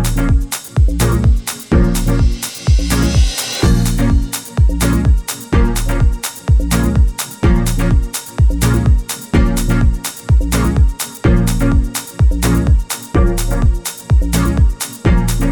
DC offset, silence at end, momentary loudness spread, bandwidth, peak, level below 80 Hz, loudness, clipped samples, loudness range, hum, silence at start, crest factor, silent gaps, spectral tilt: under 0.1%; 0 s; 4 LU; 19 kHz; -2 dBFS; -16 dBFS; -15 LUFS; under 0.1%; 1 LU; none; 0 s; 10 dB; none; -5.5 dB/octave